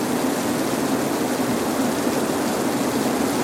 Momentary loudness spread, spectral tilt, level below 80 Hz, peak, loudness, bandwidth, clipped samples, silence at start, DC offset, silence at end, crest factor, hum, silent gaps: 1 LU; -4 dB/octave; -52 dBFS; -8 dBFS; -22 LUFS; 16.5 kHz; under 0.1%; 0 s; under 0.1%; 0 s; 14 dB; none; none